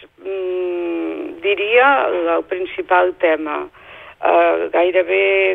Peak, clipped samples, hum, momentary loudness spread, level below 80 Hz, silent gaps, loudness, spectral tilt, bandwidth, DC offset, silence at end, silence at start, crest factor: -2 dBFS; under 0.1%; none; 12 LU; -58 dBFS; none; -17 LUFS; -6 dB/octave; 4 kHz; under 0.1%; 0 s; 0 s; 16 dB